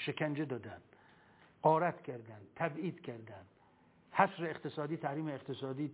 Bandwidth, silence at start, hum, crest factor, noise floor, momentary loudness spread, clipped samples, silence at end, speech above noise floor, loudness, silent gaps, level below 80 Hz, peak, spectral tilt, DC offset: 4 kHz; 0 s; none; 24 dB; -67 dBFS; 19 LU; under 0.1%; 0 s; 30 dB; -37 LUFS; none; -78 dBFS; -14 dBFS; -5 dB/octave; under 0.1%